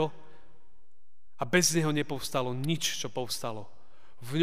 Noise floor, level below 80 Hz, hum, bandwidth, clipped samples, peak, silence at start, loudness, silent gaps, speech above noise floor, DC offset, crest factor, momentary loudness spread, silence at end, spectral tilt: -69 dBFS; -64 dBFS; none; 15.5 kHz; under 0.1%; -10 dBFS; 0 s; -30 LUFS; none; 39 dB; 1%; 22 dB; 14 LU; 0 s; -3.5 dB/octave